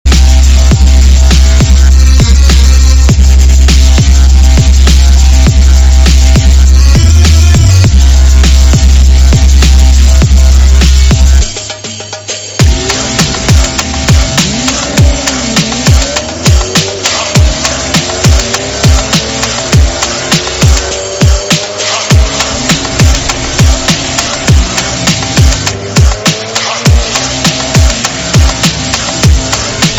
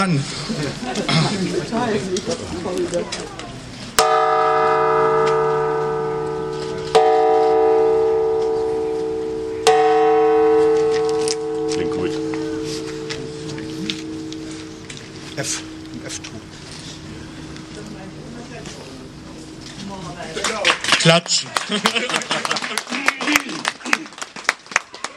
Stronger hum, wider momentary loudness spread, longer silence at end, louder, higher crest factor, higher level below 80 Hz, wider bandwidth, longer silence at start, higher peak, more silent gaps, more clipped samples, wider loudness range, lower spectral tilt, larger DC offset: neither; second, 5 LU vs 19 LU; about the same, 0 s vs 0 s; first, -7 LUFS vs -19 LUFS; second, 6 dB vs 20 dB; first, -8 dBFS vs -50 dBFS; second, 14 kHz vs 15.5 kHz; about the same, 0.05 s vs 0 s; about the same, 0 dBFS vs 0 dBFS; neither; first, 10% vs under 0.1%; second, 3 LU vs 13 LU; about the same, -4 dB/octave vs -3.5 dB/octave; neither